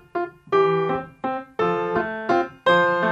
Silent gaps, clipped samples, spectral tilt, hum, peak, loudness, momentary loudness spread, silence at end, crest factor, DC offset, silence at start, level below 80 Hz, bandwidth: none; under 0.1%; -6.5 dB/octave; none; -8 dBFS; -22 LUFS; 11 LU; 0 s; 14 dB; under 0.1%; 0.15 s; -58 dBFS; 8.4 kHz